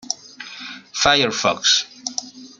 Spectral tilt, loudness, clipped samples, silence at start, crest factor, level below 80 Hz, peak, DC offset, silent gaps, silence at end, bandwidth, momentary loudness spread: -1 dB/octave; -18 LUFS; under 0.1%; 0.05 s; 20 dB; -52 dBFS; -2 dBFS; under 0.1%; none; 0.15 s; 13 kHz; 18 LU